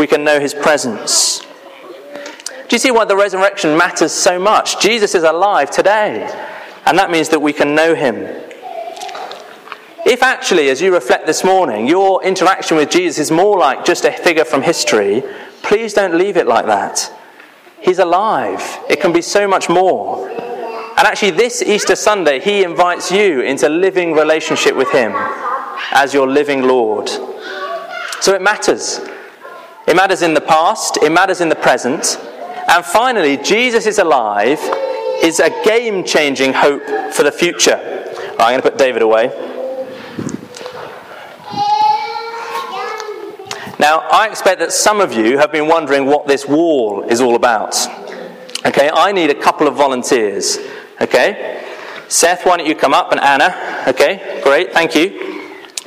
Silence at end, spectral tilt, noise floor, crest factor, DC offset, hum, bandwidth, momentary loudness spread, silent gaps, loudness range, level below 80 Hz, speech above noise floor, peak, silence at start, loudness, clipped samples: 0.05 s; -2.5 dB/octave; -40 dBFS; 14 dB; under 0.1%; none; 16 kHz; 14 LU; none; 4 LU; -56 dBFS; 28 dB; 0 dBFS; 0 s; -13 LUFS; under 0.1%